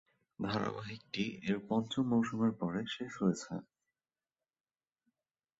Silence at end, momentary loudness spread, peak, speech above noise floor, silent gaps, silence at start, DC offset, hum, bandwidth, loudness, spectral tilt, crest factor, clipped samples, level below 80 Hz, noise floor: 1.95 s; 10 LU; -18 dBFS; over 55 dB; none; 0.4 s; under 0.1%; none; 8 kHz; -36 LUFS; -5.5 dB/octave; 20 dB; under 0.1%; -70 dBFS; under -90 dBFS